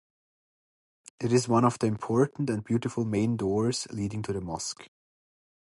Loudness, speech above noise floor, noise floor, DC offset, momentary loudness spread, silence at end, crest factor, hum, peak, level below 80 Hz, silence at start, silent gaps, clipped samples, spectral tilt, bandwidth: -28 LUFS; over 63 dB; under -90 dBFS; under 0.1%; 10 LU; 0.8 s; 20 dB; none; -10 dBFS; -58 dBFS; 1.2 s; none; under 0.1%; -6 dB/octave; 11.5 kHz